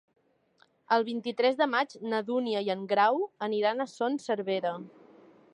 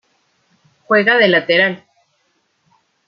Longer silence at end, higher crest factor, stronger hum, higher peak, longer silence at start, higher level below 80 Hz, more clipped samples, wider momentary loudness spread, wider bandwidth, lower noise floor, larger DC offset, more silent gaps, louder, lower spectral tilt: second, 0.65 s vs 1.3 s; about the same, 20 dB vs 18 dB; neither; second, -10 dBFS vs -2 dBFS; about the same, 0.9 s vs 0.9 s; second, -86 dBFS vs -68 dBFS; neither; about the same, 7 LU vs 7 LU; first, 10.5 kHz vs 6.6 kHz; about the same, -67 dBFS vs -64 dBFS; neither; neither; second, -29 LUFS vs -13 LUFS; second, -5 dB/octave vs -7 dB/octave